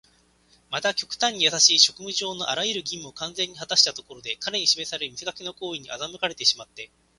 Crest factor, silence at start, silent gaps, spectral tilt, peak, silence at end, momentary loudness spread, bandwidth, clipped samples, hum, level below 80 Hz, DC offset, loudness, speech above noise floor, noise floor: 26 dB; 0.7 s; none; 0 dB/octave; 0 dBFS; 0.35 s; 16 LU; 11.5 kHz; under 0.1%; none; -66 dBFS; under 0.1%; -22 LUFS; 35 dB; -61 dBFS